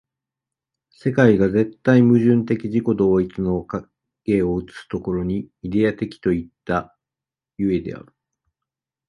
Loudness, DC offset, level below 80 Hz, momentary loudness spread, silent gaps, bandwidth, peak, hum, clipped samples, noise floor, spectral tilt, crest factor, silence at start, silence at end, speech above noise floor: -20 LUFS; under 0.1%; -46 dBFS; 13 LU; none; 9.4 kHz; -2 dBFS; none; under 0.1%; -89 dBFS; -9 dB/octave; 18 dB; 1.05 s; 1.1 s; 70 dB